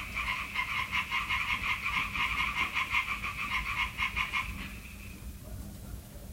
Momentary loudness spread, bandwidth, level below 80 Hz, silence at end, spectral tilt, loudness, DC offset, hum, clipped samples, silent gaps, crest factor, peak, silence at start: 16 LU; 16 kHz; -46 dBFS; 0 s; -2.5 dB/octave; -31 LUFS; under 0.1%; none; under 0.1%; none; 18 dB; -16 dBFS; 0 s